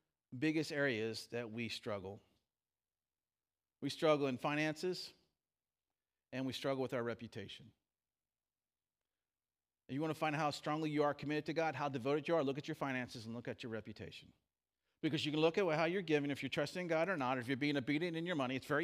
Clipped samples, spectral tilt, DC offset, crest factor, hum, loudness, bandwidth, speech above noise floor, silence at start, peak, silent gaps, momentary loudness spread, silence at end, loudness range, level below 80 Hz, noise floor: under 0.1%; -5.5 dB/octave; under 0.1%; 20 dB; none; -39 LUFS; 15.5 kHz; over 51 dB; 0.3 s; -20 dBFS; none; 12 LU; 0 s; 8 LU; -82 dBFS; under -90 dBFS